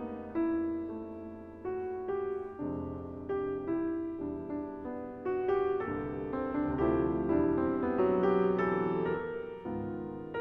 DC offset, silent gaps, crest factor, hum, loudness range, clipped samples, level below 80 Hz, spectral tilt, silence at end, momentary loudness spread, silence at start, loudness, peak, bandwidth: under 0.1%; none; 18 dB; none; 7 LU; under 0.1%; -54 dBFS; -10 dB/octave; 0 s; 11 LU; 0 s; -33 LUFS; -16 dBFS; 4.3 kHz